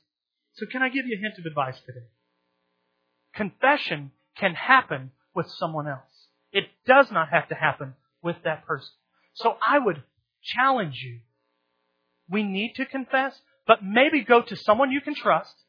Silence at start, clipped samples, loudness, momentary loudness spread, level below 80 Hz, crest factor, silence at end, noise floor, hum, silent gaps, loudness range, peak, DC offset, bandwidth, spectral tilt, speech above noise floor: 0.6 s; under 0.1%; -24 LUFS; 15 LU; -74 dBFS; 24 dB; 0.25 s; -82 dBFS; none; none; 6 LU; -2 dBFS; under 0.1%; 5.4 kHz; -7 dB/octave; 58 dB